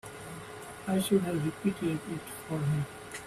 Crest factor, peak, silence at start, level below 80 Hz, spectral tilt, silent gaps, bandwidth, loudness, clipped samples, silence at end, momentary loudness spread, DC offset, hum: 18 dB; -14 dBFS; 0.05 s; -62 dBFS; -6 dB/octave; none; 15.5 kHz; -32 LUFS; under 0.1%; 0 s; 15 LU; under 0.1%; none